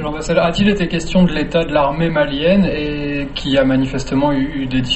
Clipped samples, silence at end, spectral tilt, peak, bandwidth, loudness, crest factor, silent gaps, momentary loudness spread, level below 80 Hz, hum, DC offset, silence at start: under 0.1%; 0 s; -6 dB/octave; -2 dBFS; 8.4 kHz; -16 LUFS; 14 dB; none; 6 LU; -30 dBFS; none; under 0.1%; 0 s